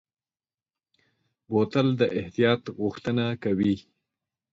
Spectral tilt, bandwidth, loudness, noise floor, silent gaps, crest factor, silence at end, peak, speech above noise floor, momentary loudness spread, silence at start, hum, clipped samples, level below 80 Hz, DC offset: -7.5 dB/octave; 7.8 kHz; -26 LUFS; under -90 dBFS; none; 20 dB; 0.75 s; -8 dBFS; over 65 dB; 6 LU; 1.5 s; none; under 0.1%; -60 dBFS; under 0.1%